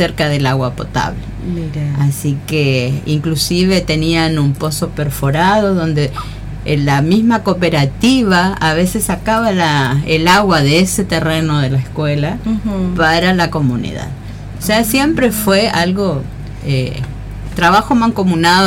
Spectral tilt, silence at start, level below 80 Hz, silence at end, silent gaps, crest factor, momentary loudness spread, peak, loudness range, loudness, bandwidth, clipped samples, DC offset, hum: -5.5 dB/octave; 0 s; -32 dBFS; 0 s; none; 10 dB; 11 LU; -2 dBFS; 3 LU; -14 LUFS; 17 kHz; under 0.1%; under 0.1%; none